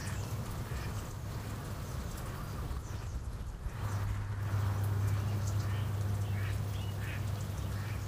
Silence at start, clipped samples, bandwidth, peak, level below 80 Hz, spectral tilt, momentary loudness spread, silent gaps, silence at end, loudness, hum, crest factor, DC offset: 0 s; under 0.1%; 15.5 kHz; -22 dBFS; -44 dBFS; -6 dB/octave; 8 LU; none; 0 s; -38 LUFS; none; 14 dB; under 0.1%